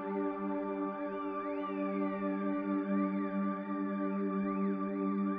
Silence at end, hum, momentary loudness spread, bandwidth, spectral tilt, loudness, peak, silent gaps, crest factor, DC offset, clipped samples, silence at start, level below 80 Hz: 0 s; none; 4 LU; 3.8 kHz; -8 dB/octave; -35 LUFS; -22 dBFS; none; 12 dB; under 0.1%; under 0.1%; 0 s; -74 dBFS